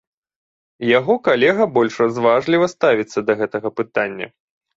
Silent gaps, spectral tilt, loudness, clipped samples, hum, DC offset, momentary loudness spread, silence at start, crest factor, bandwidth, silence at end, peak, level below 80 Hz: none; -5.5 dB/octave; -17 LUFS; under 0.1%; none; under 0.1%; 9 LU; 0.8 s; 16 dB; 7.8 kHz; 0.5 s; -2 dBFS; -62 dBFS